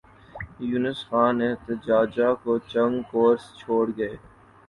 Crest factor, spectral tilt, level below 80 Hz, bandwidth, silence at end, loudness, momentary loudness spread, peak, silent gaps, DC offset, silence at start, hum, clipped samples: 16 dB; -7.5 dB/octave; -56 dBFS; 11 kHz; 0.5 s; -24 LUFS; 11 LU; -8 dBFS; none; under 0.1%; 0.35 s; none; under 0.1%